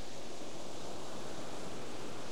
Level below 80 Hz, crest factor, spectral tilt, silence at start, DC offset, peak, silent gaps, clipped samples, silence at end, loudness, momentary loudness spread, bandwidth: -66 dBFS; 14 dB; -3.5 dB/octave; 0 s; 2%; -28 dBFS; none; under 0.1%; 0 s; -46 LUFS; 2 LU; 19.5 kHz